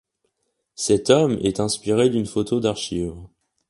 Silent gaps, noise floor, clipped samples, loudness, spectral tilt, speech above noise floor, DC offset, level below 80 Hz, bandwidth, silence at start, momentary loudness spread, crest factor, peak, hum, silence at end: none; -74 dBFS; under 0.1%; -21 LUFS; -5 dB/octave; 54 dB; under 0.1%; -48 dBFS; 11.5 kHz; 0.8 s; 10 LU; 22 dB; 0 dBFS; none; 0.45 s